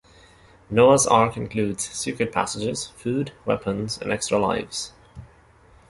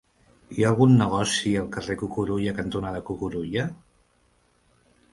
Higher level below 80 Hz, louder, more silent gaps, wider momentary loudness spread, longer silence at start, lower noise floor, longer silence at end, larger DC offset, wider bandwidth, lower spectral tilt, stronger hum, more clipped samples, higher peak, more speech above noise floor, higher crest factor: about the same, -52 dBFS vs -50 dBFS; about the same, -23 LUFS vs -24 LUFS; neither; about the same, 11 LU vs 13 LU; first, 0.7 s vs 0.5 s; second, -53 dBFS vs -64 dBFS; second, 0.65 s vs 1.35 s; neither; about the same, 11.5 kHz vs 11.5 kHz; second, -4 dB/octave vs -6 dB/octave; neither; neither; first, -2 dBFS vs -6 dBFS; second, 31 dB vs 41 dB; about the same, 22 dB vs 20 dB